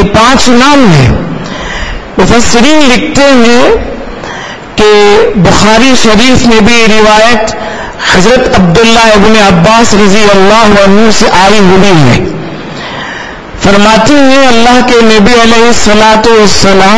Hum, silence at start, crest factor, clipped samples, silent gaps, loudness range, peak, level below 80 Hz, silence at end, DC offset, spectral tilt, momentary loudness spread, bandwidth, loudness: none; 0 s; 6 dB; 20%; none; 3 LU; 0 dBFS; -22 dBFS; 0 s; 20%; -4.5 dB/octave; 13 LU; 11 kHz; -3 LUFS